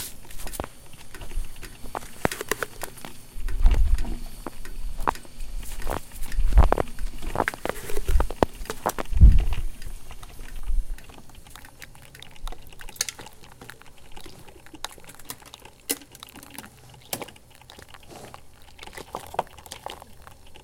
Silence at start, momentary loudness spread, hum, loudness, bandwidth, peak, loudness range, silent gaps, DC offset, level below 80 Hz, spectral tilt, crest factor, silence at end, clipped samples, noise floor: 0 s; 21 LU; none; -29 LUFS; 17 kHz; 0 dBFS; 13 LU; none; under 0.1%; -28 dBFS; -4.5 dB/octave; 26 dB; 0.05 s; under 0.1%; -48 dBFS